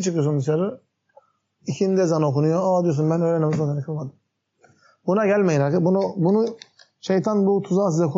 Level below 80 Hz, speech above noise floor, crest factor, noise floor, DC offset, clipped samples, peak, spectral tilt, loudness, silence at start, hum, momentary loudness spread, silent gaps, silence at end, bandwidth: -70 dBFS; 40 dB; 12 dB; -61 dBFS; under 0.1%; under 0.1%; -8 dBFS; -8 dB/octave; -21 LUFS; 0 s; none; 11 LU; none; 0 s; 7.8 kHz